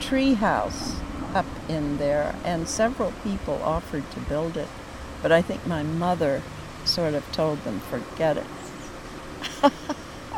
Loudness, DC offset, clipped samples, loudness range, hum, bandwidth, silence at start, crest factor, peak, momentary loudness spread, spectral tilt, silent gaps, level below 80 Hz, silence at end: -26 LUFS; under 0.1%; under 0.1%; 2 LU; none; 17 kHz; 0 s; 22 dB; -4 dBFS; 14 LU; -5 dB/octave; none; -42 dBFS; 0 s